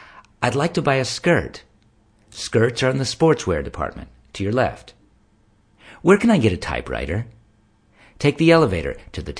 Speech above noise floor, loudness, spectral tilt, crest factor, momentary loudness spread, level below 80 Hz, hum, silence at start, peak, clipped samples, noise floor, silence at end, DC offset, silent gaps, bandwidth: 38 dB; -20 LUFS; -6 dB/octave; 20 dB; 17 LU; -42 dBFS; none; 0 s; 0 dBFS; under 0.1%; -58 dBFS; 0.05 s; under 0.1%; none; 10.5 kHz